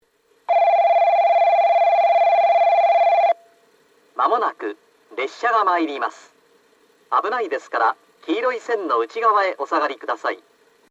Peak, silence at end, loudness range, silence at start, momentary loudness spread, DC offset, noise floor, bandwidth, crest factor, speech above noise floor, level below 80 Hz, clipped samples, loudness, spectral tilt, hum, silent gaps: -6 dBFS; 0.55 s; 7 LU; 0.5 s; 12 LU; under 0.1%; -57 dBFS; 7.6 kHz; 14 dB; 36 dB; -84 dBFS; under 0.1%; -19 LUFS; -2.5 dB/octave; none; none